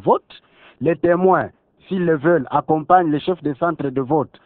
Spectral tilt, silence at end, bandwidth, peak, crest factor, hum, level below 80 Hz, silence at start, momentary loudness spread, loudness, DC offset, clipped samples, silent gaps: -11 dB/octave; 0.2 s; 4.3 kHz; 0 dBFS; 18 dB; none; -56 dBFS; 0.05 s; 8 LU; -19 LUFS; under 0.1%; under 0.1%; none